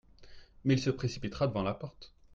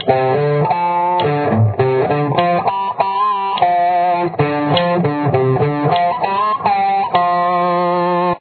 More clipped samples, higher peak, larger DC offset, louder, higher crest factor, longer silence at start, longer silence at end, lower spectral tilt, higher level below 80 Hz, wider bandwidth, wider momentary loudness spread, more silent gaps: neither; second, -16 dBFS vs 0 dBFS; neither; second, -33 LUFS vs -15 LUFS; about the same, 18 dB vs 14 dB; first, 0.2 s vs 0 s; first, 0.25 s vs 0 s; second, -6.5 dB/octave vs -10.5 dB/octave; about the same, -56 dBFS vs -54 dBFS; first, 7.6 kHz vs 4.6 kHz; first, 10 LU vs 2 LU; neither